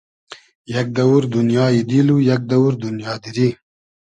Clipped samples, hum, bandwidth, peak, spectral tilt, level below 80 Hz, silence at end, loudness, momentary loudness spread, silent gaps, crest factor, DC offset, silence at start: under 0.1%; none; 9 kHz; -2 dBFS; -7.5 dB/octave; -56 dBFS; 0.6 s; -17 LUFS; 10 LU; 0.55-0.65 s; 16 dB; under 0.1%; 0.3 s